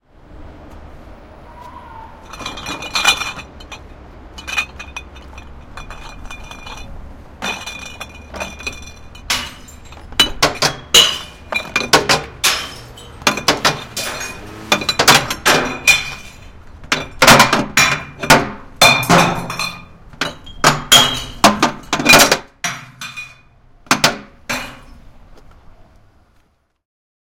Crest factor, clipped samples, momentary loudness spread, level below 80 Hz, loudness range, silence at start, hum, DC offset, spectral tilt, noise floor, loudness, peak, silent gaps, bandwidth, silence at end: 18 dB; 0.1%; 24 LU; -40 dBFS; 16 LU; 0.3 s; none; under 0.1%; -2 dB/octave; -57 dBFS; -14 LUFS; 0 dBFS; none; over 20 kHz; 2.5 s